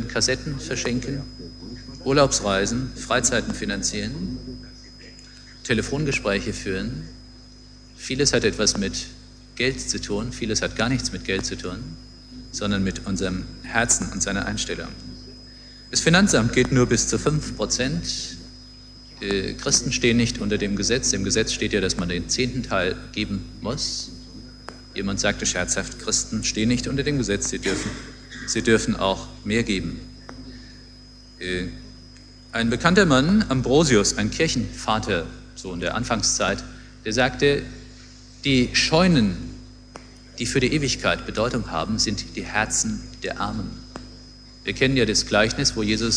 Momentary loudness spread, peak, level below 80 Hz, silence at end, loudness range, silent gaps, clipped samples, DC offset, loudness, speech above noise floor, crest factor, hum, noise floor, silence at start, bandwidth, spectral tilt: 22 LU; 0 dBFS; -40 dBFS; 0 s; 5 LU; none; under 0.1%; under 0.1%; -22 LUFS; 23 dB; 22 dB; 50 Hz at -40 dBFS; -45 dBFS; 0 s; 11 kHz; -3.5 dB/octave